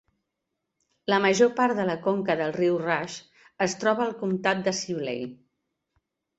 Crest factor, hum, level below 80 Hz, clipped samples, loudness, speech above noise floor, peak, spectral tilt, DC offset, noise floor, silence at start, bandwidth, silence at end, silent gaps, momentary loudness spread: 20 dB; none; -68 dBFS; under 0.1%; -25 LUFS; 57 dB; -8 dBFS; -4.5 dB/octave; under 0.1%; -82 dBFS; 1.1 s; 8.2 kHz; 1.05 s; none; 13 LU